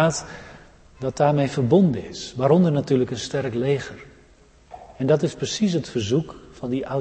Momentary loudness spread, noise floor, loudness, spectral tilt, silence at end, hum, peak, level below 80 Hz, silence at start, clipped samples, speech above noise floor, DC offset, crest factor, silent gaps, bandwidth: 15 LU; -53 dBFS; -22 LUFS; -6 dB/octave; 0 s; none; -4 dBFS; -52 dBFS; 0 s; under 0.1%; 31 dB; under 0.1%; 18 dB; none; 8.8 kHz